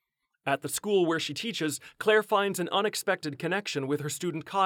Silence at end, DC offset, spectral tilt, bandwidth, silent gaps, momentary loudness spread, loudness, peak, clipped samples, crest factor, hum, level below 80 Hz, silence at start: 0 s; under 0.1%; -3.5 dB/octave; 19.5 kHz; none; 7 LU; -29 LUFS; -12 dBFS; under 0.1%; 18 dB; none; -76 dBFS; 0.45 s